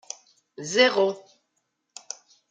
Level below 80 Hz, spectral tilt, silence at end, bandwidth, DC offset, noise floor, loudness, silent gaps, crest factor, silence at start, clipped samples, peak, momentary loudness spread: -80 dBFS; -2 dB/octave; 1.3 s; 9.4 kHz; under 0.1%; -76 dBFS; -22 LUFS; none; 22 dB; 0.6 s; under 0.1%; -4 dBFS; 21 LU